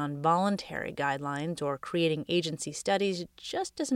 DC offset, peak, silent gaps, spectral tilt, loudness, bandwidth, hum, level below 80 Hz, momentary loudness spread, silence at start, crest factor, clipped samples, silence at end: under 0.1%; -12 dBFS; none; -4.5 dB/octave; -31 LUFS; 16 kHz; none; -66 dBFS; 8 LU; 0 s; 18 dB; under 0.1%; 0 s